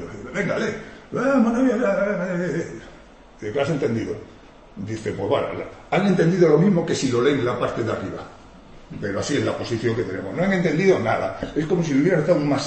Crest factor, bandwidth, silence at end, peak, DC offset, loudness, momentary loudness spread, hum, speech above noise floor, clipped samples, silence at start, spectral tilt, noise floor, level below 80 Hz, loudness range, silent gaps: 16 dB; 8.8 kHz; 0 s; -6 dBFS; under 0.1%; -22 LUFS; 14 LU; none; 25 dB; under 0.1%; 0 s; -6.5 dB/octave; -46 dBFS; -50 dBFS; 6 LU; none